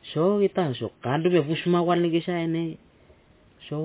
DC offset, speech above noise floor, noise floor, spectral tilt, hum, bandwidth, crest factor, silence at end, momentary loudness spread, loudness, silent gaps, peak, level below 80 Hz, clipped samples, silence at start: under 0.1%; 33 dB; -56 dBFS; -11 dB/octave; none; 4 kHz; 14 dB; 0 s; 10 LU; -25 LUFS; none; -10 dBFS; -64 dBFS; under 0.1%; 0.05 s